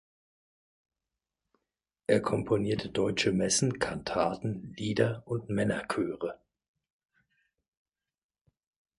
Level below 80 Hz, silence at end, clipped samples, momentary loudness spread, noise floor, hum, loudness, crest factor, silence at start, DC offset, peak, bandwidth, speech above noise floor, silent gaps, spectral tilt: -60 dBFS; 2.65 s; under 0.1%; 9 LU; -89 dBFS; none; -30 LUFS; 22 dB; 2.1 s; under 0.1%; -10 dBFS; 11.5 kHz; 60 dB; none; -4.5 dB/octave